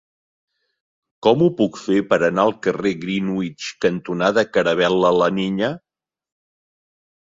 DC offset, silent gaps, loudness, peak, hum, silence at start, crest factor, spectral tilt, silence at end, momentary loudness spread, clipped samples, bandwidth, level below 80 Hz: under 0.1%; none; -19 LUFS; -2 dBFS; none; 1.25 s; 18 dB; -6 dB/octave; 1.6 s; 7 LU; under 0.1%; 7.8 kHz; -58 dBFS